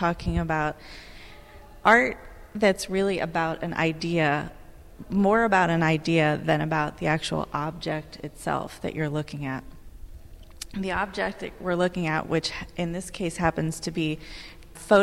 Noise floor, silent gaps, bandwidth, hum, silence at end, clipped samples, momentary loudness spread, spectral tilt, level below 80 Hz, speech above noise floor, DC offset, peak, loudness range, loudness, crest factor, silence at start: -46 dBFS; none; 15.5 kHz; none; 0 s; under 0.1%; 18 LU; -5.5 dB/octave; -44 dBFS; 21 dB; under 0.1%; -6 dBFS; 8 LU; -26 LUFS; 20 dB; 0 s